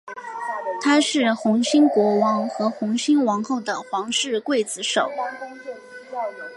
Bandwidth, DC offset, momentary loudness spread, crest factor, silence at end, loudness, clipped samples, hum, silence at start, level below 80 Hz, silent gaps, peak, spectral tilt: 11.5 kHz; under 0.1%; 16 LU; 16 dB; 0 s; -21 LUFS; under 0.1%; none; 0.05 s; -76 dBFS; none; -6 dBFS; -3.5 dB/octave